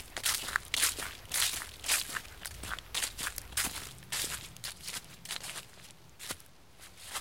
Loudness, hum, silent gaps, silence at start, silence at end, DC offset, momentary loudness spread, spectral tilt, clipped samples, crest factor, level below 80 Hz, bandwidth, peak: -34 LUFS; none; none; 0 s; 0 s; 0.1%; 15 LU; 0.5 dB/octave; under 0.1%; 28 dB; -56 dBFS; 17 kHz; -10 dBFS